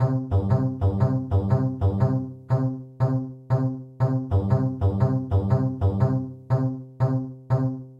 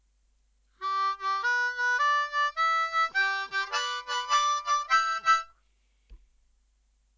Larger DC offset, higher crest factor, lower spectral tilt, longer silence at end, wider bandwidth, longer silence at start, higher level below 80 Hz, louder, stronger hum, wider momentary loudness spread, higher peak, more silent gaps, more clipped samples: neither; about the same, 14 dB vs 18 dB; first, -11 dB/octave vs 2 dB/octave; second, 0.05 s vs 1 s; second, 5.2 kHz vs 7.8 kHz; second, 0 s vs 0.8 s; first, -44 dBFS vs -64 dBFS; about the same, -24 LUFS vs -26 LUFS; neither; about the same, 5 LU vs 6 LU; about the same, -8 dBFS vs -10 dBFS; neither; neither